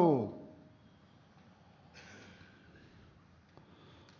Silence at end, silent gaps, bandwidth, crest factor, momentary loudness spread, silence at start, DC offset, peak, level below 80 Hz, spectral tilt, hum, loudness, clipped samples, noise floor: 2.2 s; none; 7 kHz; 24 dB; 21 LU; 0 s; under 0.1%; -16 dBFS; -70 dBFS; -8 dB/octave; none; -35 LUFS; under 0.1%; -62 dBFS